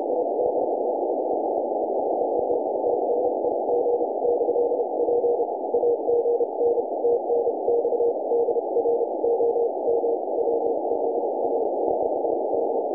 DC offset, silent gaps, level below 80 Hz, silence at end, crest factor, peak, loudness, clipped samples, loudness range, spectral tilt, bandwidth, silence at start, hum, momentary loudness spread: under 0.1%; none; -64 dBFS; 0 s; 14 dB; -10 dBFS; -24 LUFS; under 0.1%; 1 LU; -12 dB/octave; 1.1 kHz; 0 s; none; 3 LU